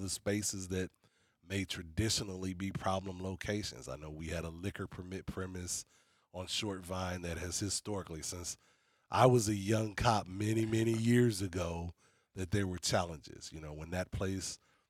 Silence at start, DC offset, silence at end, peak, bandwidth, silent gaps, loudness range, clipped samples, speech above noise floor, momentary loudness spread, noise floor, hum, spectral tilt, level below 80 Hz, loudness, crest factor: 0 s; under 0.1%; 0.35 s; -12 dBFS; 16 kHz; none; 9 LU; under 0.1%; 32 dB; 15 LU; -67 dBFS; none; -4.5 dB/octave; -58 dBFS; -36 LUFS; 24 dB